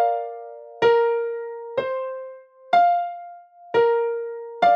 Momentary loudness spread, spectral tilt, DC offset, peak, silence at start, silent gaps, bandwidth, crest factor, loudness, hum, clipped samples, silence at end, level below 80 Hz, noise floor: 19 LU; -5 dB/octave; under 0.1%; -6 dBFS; 0 s; none; 6.6 kHz; 16 dB; -22 LUFS; none; under 0.1%; 0 s; -70 dBFS; -43 dBFS